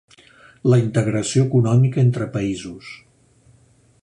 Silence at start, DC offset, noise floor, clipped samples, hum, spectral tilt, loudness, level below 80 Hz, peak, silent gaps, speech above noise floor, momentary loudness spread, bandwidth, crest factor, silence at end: 0.65 s; under 0.1%; -55 dBFS; under 0.1%; none; -7 dB/octave; -19 LUFS; -52 dBFS; -4 dBFS; none; 37 dB; 16 LU; 10.5 kHz; 16 dB; 1.1 s